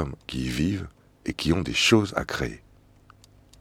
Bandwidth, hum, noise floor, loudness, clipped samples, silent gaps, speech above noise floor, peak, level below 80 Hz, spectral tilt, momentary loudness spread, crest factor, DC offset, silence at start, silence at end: 16.5 kHz; 50 Hz at -50 dBFS; -55 dBFS; -25 LUFS; under 0.1%; none; 30 dB; -6 dBFS; -44 dBFS; -4.5 dB/octave; 16 LU; 22 dB; under 0.1%; 0 s; 1.05 s